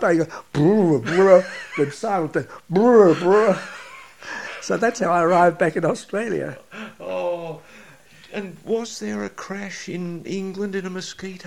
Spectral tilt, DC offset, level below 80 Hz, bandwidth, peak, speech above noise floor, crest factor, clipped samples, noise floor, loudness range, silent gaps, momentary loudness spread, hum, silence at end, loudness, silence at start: -6 dB/octave; 0.2%; -62 dBFS; 13 kHz; 0 dBFS; 28 dB; 20 dB; under 0.1%; -48 dBFS; 12 LU; none; 18 LU; none; 0 s; -20 LUFS; 0 s